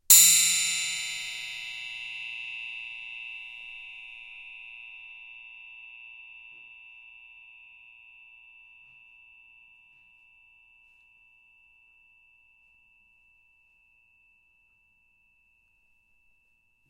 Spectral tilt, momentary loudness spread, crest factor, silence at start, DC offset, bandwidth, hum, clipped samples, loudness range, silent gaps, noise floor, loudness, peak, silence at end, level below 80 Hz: 3.5 dB/octave; 27 LU; 30 dB; 0.1 s; under 0.1%; 16 kHz; none; under 0.1%; 24 LU; none; -68 dBFS; -24 LUFS; -2 dBFS; 9.8 s; -72 dBFS